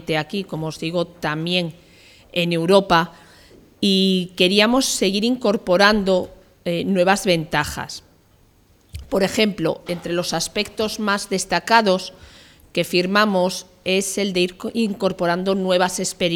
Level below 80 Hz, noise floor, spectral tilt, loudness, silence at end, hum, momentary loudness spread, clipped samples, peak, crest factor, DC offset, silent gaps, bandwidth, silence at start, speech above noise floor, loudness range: -50 dBFS; -55 dBFS; -4 dB/octave; -20 LUFS; 0 s; none; 12 LU; under 0.1%; 0 dBFS; 20 dB; under 0.1%; none; 18.5 kHz; 0 s; 36 dB; 5 LU